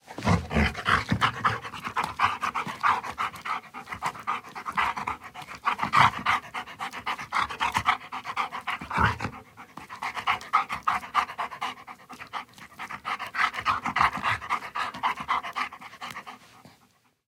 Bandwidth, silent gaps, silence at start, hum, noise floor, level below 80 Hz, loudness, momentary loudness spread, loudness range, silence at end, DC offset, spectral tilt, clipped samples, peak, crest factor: 17.5 kHz; none; 0.05 s; none; -64 dBFS; -48 dBFS; -28 LUFS; 14 LU; 4 LU; 0.6 s; under 0.1%; -4 dB/octave; under 0.1%; -4 dBFS; 24 dB